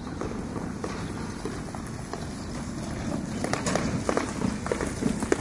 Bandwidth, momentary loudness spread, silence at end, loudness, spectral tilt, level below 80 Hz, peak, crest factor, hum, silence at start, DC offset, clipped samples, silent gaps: 11.5 kHz; 8 LU; 0 s; -31 LUFS; -5 dB/octave; -44 dBFS; -4 dBFS; 26 dB; none; 0 s; under 0.1%; under 0.1%; none